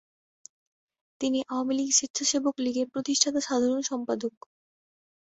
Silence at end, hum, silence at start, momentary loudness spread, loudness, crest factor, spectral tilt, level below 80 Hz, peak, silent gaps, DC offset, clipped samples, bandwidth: 1.1 s; none; 1.2 s; 8 LU; -27 LUFS; 22 dB; -1.5 dB/octave; -72 dBFS; -6 dBFS; 2.10-2.14 s; under 0.1%; under 0.1%; 8.4 kHz